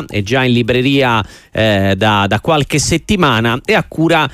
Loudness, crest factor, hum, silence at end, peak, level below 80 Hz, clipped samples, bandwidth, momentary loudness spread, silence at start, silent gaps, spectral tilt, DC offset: -13 LUFS; 12 dB; none; 0 s; 0 dBFS; -36 dBFS; under 0.1%; 15.5 kHz; 3 LU; 0 s; none; -5 dB/octave; under 0.1%